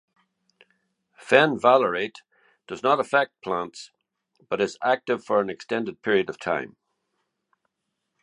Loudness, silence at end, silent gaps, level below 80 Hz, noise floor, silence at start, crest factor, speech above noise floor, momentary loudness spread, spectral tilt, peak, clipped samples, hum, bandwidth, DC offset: -23 LUFS; 1.55 s; none; -70 dBFS; -80 dBFS; 1.25 s; 26 dB; 57 dB; 13 LU; -5 dB/octave; 0 dBFS; under 0.1%; none; 11 kHz; under 0.1%